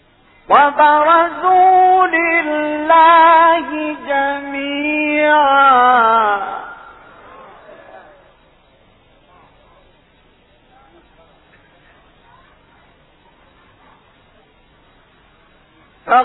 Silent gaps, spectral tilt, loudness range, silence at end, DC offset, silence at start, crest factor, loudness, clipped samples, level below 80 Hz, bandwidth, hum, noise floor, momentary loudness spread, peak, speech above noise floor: none; -7 dB/octave; 8 LU; 0 s; under 0.1%; 0.5 s; 16 dB; -12 LUFS; under 0.1%; -54 dBFS; 4.1 kHz; none; -52 dBFS; 13 LU; 0 dBFS; 42 dB